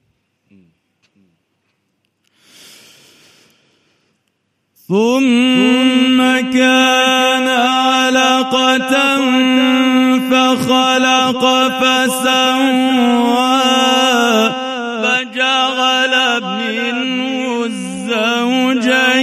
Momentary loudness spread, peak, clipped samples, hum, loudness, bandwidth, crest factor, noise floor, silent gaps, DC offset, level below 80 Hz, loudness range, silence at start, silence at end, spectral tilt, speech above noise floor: 6 LU; 0 dBFS; under 0.1%; none; -12 LUFS; 15 kHz; 14 dB; -66 dBFS; none; under 0.1%; -64 dBFS; 4 LU; 4.9 s; 0 s; -3 dB/octave; 54 dB